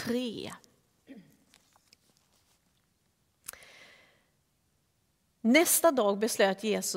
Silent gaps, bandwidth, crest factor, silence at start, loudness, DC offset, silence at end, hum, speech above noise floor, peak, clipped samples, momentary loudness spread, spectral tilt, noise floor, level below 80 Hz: none; 16 kHz; 22 dB; 0 s; -26 LUFS; under 0.1%; 0 s; none; 47 dB; -10 dBFS; under 0.1%; 23 LU; -3 dB/octave; -74 dBFS; -76 dBFS